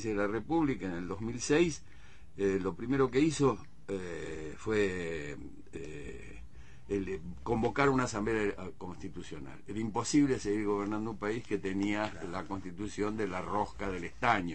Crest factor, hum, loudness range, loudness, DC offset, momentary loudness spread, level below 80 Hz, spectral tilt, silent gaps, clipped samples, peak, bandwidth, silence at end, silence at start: 22 dB; none; 5 LU; -33 LUFS; 0.5%; 16 LU; -54 dBFS; -5.5 dB/octave; none; under 0.1%; -12 dBFS; 8.8 kHz; 0 s; 0 s